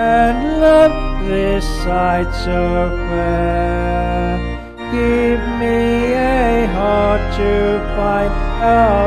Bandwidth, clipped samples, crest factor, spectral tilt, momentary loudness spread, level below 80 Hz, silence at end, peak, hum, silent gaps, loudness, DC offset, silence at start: 12 kHz; under 0.1%; 14 dB; -7 dB/octave; 7 LU; -22 dBFS; 0 s; 0 dBFS; none; none; -16 LUFS; under 0.1%; 0 s